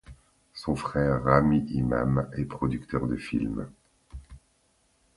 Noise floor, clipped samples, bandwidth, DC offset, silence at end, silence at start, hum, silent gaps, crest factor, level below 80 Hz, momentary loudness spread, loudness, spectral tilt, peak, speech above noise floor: -68 dBFS; under 0.1%; 11.5 kHz; under 0.1%; 0.8 s; 0.1 s; none; none; 24 dB; -44 dBFS; 23 LU; -27 LUFS; -8.5 dB/octave; -4 dBFS; 42 dB